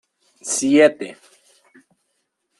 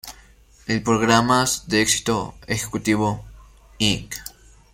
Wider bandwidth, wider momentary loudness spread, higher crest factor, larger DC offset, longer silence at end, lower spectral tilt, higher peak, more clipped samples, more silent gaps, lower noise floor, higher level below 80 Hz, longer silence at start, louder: second, 12.5 kHz vs 16.5 kHz; first, 20 LU vs 17 LU; about the same, 20 dB vs 20 dB; neither; first, 1.45 s vs 0.45 s; about the same, -3 dB/octave vs -3.5 dB/octave; about the same, -2 dBFS vs -2 dBFS; neither; neither; first, -72 dBFS vs -51 dBFS; second, -66 dBFS vs -46 dBFS; first, 0.45 s vs 0.05 s; first, -16 LUFS vs -20 LUFS